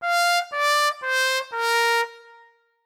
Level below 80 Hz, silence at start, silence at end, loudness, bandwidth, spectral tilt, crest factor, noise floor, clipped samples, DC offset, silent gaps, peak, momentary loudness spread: -86 dBFS; 0 s; 0.65 s; -21 LUFS; 17.5 kHz; 4 dB/octave; 14 dB; -55 dBFS; under 0.1%; under 0.1%; none; -10 dBFS; 4 LU